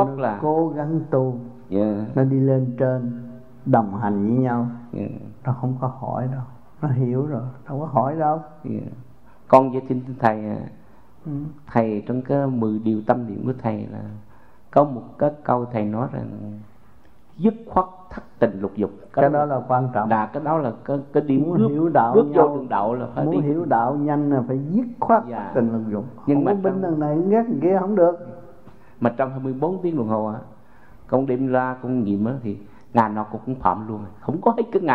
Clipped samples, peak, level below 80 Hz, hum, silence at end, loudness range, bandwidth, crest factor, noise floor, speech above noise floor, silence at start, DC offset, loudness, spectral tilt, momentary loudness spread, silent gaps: under 0.1%; 0 dBFS; -56 dBFS; none; 0 s; 5 LU; 4.9 kHz; 22 dB; -53 dBFS; 32 dB; 0 s; 0.5%; -22 LUFS; -11 dB/octave; 13 LU; none